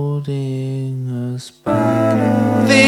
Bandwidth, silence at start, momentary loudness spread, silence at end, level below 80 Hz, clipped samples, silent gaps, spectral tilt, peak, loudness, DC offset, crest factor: 17 kHz; 0 s; 9 LU; 0 s; -54 dBFS; under 0.1%; none; -6 dB/octave; 0 dBFS; -18 LUFS; under 0.1%; 16 dB